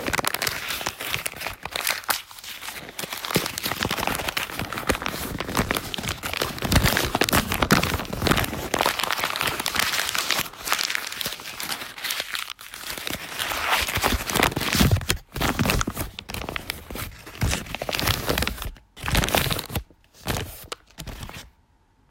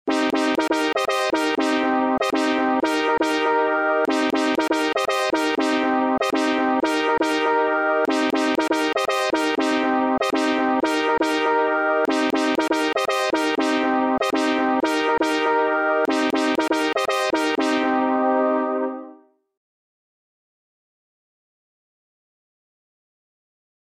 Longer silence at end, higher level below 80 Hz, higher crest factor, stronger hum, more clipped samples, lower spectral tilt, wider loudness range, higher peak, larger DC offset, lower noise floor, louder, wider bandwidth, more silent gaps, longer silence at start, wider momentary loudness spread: second, 0.6 s vs 4.85 s; first, -38 dBFS vs -60 dBFS; first, 24 dB vs 14 dB; neither; neither; about the same, -3 dB/octave vs -3 dB/octave; first, 5 LU vs 2 LU; first, -2 dBFS vs -8 dBFS; neither; first, -61 dBFS vs -48 dBFS; second, -25 LUFS vs -21 LUFS; about the same, 16.5 kHz vs 16 kHz; neither; about the same, 0 s vs 0.05 s; first, 13 LU vs 1 LU